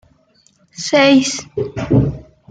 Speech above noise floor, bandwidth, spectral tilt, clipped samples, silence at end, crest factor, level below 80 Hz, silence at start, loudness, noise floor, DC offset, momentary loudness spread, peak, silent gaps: 42 dB; 9.4 kHz; -5 dB/octave; under 0.1%; 0.3 s; 16 dB; -38 dBFS; 0.8 s; -15 LUFS; -55 dBFS; under 0.1%; 14 LU; -2 dBFS; none